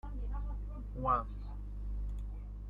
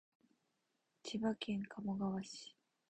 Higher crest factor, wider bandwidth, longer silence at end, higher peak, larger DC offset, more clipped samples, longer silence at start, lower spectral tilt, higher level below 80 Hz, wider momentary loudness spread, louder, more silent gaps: about the same, 20 dB vs 16 dB; second, 3.6 kHz vs 9.2 kHz; second, 0 s vs 0.4 s; first, -18 dBFS vs -28 dBFS; neither; neither; second, 0.05 s vs 1.05 s; first, -9.5 dB/octave vs -5.5 dB/octave; first, -40 dBFS vs -76 dBFS; about the same, 12 LU vs 13 LU; about the same, -40 LUFS vs -42 LUFS; neither